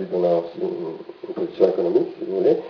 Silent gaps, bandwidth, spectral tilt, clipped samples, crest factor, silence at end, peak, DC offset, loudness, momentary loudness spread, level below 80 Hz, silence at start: none; 5.4 kHz; -9 dB/octave; under 0.1%; 18 dB; 0 s; -4 dBFS; under 0.1%; -22 LUFS; 13 LU; -70 dBFS; 0 s